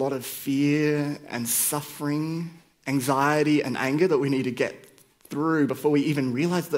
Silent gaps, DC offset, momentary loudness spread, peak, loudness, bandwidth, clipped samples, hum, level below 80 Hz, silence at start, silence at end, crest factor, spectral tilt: none; under 0.1%; 8 LU; -8 dBFS; -25 LUFS; 16 kHz; under 0.1%; none; -70 dBFS; 0 s; 0 s; 18 dB; -5 dB/octave